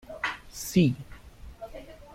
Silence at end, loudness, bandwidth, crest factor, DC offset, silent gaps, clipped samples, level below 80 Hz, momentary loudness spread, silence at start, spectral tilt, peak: 0 s; -28 LUFS; 16.5 kHz; 20 dB; under 0.1%; none; under 0.1%; -50 dBFS; 23 LU; 0.05 s; -5.5 dB/octave; -10 dBFS